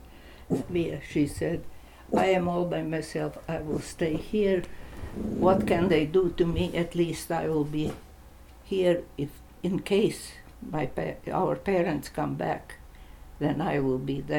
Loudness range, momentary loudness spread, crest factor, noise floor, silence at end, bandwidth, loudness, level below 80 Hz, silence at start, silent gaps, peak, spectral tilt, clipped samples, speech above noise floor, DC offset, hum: 4 LU; 12 LU; 20 dB; -49 dBFS; 0 s; 18 kHz; -28 LUFS; -46 dBFS; 0 s; none; -8 dBFS; -6.5 dB/octave; under 0.1%; 22 dB; under 0.1%; none